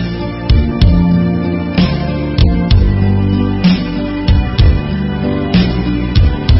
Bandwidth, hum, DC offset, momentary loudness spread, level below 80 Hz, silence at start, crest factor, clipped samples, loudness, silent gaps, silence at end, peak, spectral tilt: 5.8 kHz; none; under 0.1%; 5 LU; -16 dBFS; 0 s; 12 dB; under 0.1%; -13 LUFS; none; 0 s; 0 dBFS; -10.5 dB/octave